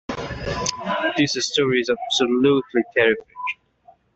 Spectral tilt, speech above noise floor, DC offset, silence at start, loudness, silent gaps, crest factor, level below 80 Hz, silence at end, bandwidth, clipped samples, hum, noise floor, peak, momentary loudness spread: -3.5 dB/octave; 34 dB; under 0.1%; 0.1 s; -21 LUFS; none; 18 dB; -48 dBFS; 0.6 s; 8.2 kHz; under 0.1%; none; -54 dBFS; -4 dBFS; 11 LU